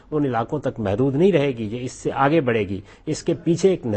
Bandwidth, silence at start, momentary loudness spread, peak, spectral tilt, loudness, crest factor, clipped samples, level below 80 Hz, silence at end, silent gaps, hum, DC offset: 8.8 kHz; 0.1 s; 10 LU; -4 dBFS; -6.5 dB/octave; -22 LUFS; 16 dB; under 0.1%; -50 dBFS; 0 s; none; none; under 0.1%